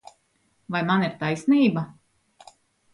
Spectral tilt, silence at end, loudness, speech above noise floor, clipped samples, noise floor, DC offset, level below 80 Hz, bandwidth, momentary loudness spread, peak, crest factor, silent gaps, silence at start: -7 dB/octave; 1.05 s; -23 LUFS; 46 dB; under 0.1%; -68 dBFS; under 0.1%; -66 dBFS; 11 kHz; 11 LU; -8 dBFS; 16 dB; none; 0.7 s